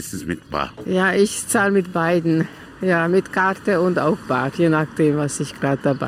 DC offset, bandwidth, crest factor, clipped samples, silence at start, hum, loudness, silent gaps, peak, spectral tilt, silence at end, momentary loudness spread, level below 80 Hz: under 0.1%; 16 kHz; 14 dB; under 0.1%; 0 s; none; -20 LUFS; none; -4 dBFS; -5.5 dB/octave; 0 s; 8 LU; -52 dBFS